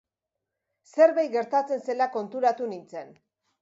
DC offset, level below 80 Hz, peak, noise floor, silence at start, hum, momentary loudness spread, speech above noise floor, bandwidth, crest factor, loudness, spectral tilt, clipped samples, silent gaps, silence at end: under 0.1%; -84 dBFS; -8 dBFS; -86 dBFS; 0.95 s; none; 17 LU; 61 dB; 7.8 kHz; 18 dB; -25 LUFS; -5 dB/octave; under 0.1%; none; 0.55 s